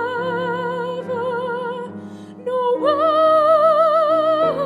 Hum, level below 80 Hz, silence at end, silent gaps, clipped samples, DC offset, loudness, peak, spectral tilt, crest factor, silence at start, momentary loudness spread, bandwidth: none; -68 dBFS; 0 s; none; under 0.1%; under 0.1%; -18 LUFS; -4 dBFS; -6.5 dB/octave; 14 dB; 0 s; 16 LU; 11 kHz